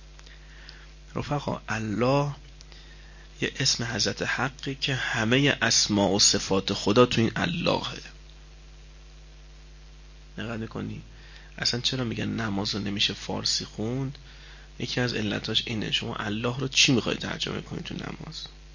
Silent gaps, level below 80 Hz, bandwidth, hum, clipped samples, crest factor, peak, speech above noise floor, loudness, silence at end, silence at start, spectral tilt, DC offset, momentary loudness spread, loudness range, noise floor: none; -48 dBFS; 7.4 kHz; none; under 0.1%; 22 dB; -6 dBFS; 20 dB; -26 LUFS; 0 s; 0 s; -3.5 dB/octave; under 0.1%; 17 LU; 11 LU; -47 dBFS